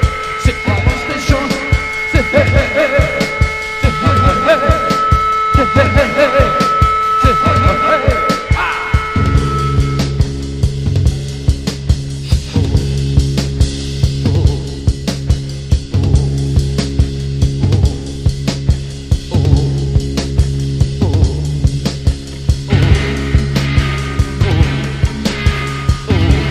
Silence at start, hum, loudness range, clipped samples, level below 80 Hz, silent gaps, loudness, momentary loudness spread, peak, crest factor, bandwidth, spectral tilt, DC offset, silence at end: 0 s; none; 5 LU; 0.2%; -18 dBFS; none; -14 LUFS; 7 LU; 0 dBFS; 14 dB; 14 kHz; -6 dB/octave; under 0.1%; 0 s